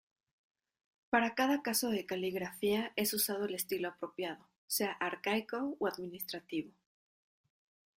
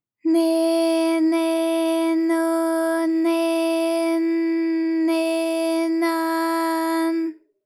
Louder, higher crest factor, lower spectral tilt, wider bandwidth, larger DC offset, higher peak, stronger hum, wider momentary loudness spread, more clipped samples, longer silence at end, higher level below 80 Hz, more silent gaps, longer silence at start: second, -35 LUFS vs -21 LUFS; first, 22 dB vs 10 dB; about the same, -3 dB/octave vs -2 dB/octave; about the same, 16 kHz vs 15 kHz; neither; second, -16 dBFS vs -10 dBFS; neither; first, 10 LU vs 3 LU; neither; first, 1.3 s vs 0.3 s; first, -76 dBFS vs under -90 dBFS; first, 4.56-4.68 s vs none; first, 1.1 s vs 0.25 s